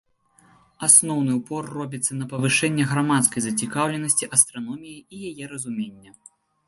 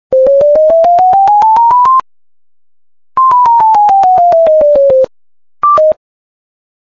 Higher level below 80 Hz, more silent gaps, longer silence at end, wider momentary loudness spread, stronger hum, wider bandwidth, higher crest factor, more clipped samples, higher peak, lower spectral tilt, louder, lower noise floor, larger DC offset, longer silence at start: second, -66 dBFS vs -46 dBFS; neither; second, 0.7 s vs 0.9 s; first, 20 LU vs 6 LU; neither; first, 12 kHz vs 7.2 kHz; first, 24 dB vs 6 dB; neither; about the same, 0 dBFS vs -2 dBFS; second, -3 dB/octave vs -5.5 dB/octave; second, -20 LUFS vs -7 LUFS; second, -58 dBFS vs under -90 dBFS; second, under 0.1% vs 0.6%; first, 0.8 s vs 0.1 s